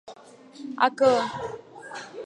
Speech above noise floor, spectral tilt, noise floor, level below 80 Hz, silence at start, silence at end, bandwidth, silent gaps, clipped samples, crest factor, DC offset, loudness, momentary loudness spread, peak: 22 dB; -4 dB/octave; -47 dBFS; -66 dBFS; 0.05 s; 0 s; 10 kHz; none; under 0.1%; 22 dB; under 0.1%; -23 LUFS; 20 LU; -6 dBFS